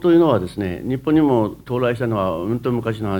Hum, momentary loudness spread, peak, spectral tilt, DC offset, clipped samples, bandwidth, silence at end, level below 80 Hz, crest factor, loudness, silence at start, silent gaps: none; 8 LU; -2 dBFS; -8.5 dB/octave; under 0.1%; under 0.1%; 17.5 kHz; 0 s; -46 dBFS; 16 dB; -20 LUFS; 0 s; none